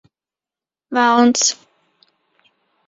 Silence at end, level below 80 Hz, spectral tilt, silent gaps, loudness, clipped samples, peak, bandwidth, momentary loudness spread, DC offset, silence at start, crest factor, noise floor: 1.35 s; -68 dBFS; -1.5 dB/octave; none; -15 LUFS; under 0.1%; 0 dBFS; 7.8 kHz; 12 LU; under 0.1%; 0.9 s; 20 dB; -90 dBFS